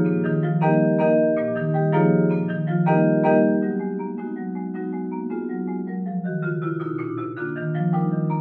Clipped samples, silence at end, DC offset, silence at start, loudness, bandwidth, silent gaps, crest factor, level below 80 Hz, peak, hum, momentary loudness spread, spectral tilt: under 0.1%; 0 s; under 0.1%; 0 s; -22 LUFS; 4.1 kHz; none; 16 dB; -72 dBFS; -6 dBFS; none; 10 LU; -12 dB/octave